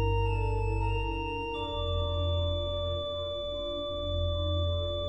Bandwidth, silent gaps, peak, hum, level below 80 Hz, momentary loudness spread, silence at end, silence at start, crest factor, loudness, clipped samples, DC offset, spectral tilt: 8.2 kHz; none; -18 dBFS; none; -36 dBFS; 4 LU; 0 s; 0 s; 12 dB; -32 LUFS; under 0.1%; 0.2%; -7 dB/octave